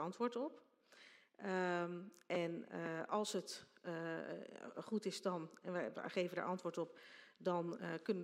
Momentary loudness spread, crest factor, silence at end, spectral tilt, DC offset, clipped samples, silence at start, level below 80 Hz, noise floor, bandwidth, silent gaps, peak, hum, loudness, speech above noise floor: 11 LU; 18 dB; 0 s; -5 dB/octave; under 0.1%; under 0.1%; 0 s; under -90 dBFS; -66 dBFS; 15.5 kHz; none; -26 dBFS; none; -44 LUFS; 22 dB